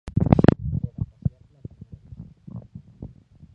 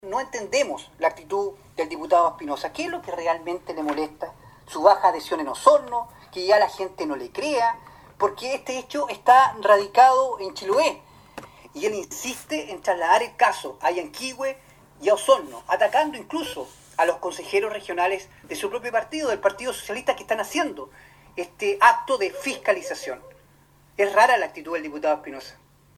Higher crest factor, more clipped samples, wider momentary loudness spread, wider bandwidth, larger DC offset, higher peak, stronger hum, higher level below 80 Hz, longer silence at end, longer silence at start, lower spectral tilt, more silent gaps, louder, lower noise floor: about the same, 24 dB vs 22 dB; neither; first, 26 LU vs 15 LU; second, 7.4 kHz vs 17.5 kHz; neither; about the same, 0 dBFS vs 0 dBFS; neither; first, -38 dBFS vs -60 dBFS; about the same, 0.5 s vs 0.45 s; about the same, 0.05 s vs 0.05 s; first, -10 dB/octave vs -2.5 dB/octave; neither; about the same, -22 LUFS vs -23 LUFS; second, -45 dBFS vs -56 dBFS